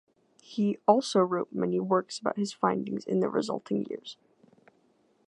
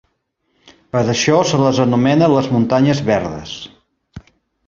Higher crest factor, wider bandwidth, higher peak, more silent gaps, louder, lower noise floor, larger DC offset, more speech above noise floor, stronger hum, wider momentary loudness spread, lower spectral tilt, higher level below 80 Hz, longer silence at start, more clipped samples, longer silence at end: first, 24 dB vs 16 dB; first, 11 kHz vs 7.6 kHz; second, -6 dBFS vs -2 dBFS; neither; second, -29 LUFS vs -15 LUFS; about the same, -67 dBFS vs -68 dBFS; neither; second, 39 dB vs 53 dB; neither; second, 10 LU vs 15 LU; about the same, -6 dB/octave vs -5.5 dB/octave; second, -78 dBFS vs -48 dBFS; second, 0.5 s vs 0.95 s; neither; first, 1.15 s vs 0.5 s